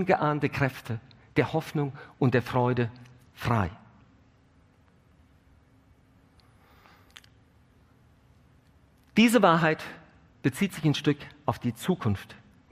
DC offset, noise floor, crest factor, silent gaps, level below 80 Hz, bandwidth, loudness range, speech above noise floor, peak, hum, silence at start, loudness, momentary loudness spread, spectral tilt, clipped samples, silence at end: under 0.1%; -61 dBFS; 24 dB; none; -60 dBFS; 15.5 kHz; 11 LU; 35 dB; -6 dBFS; none; 0 s; -27 LUFS; 14 LU; -6 dB/octave; under 0.1%; 0.4 s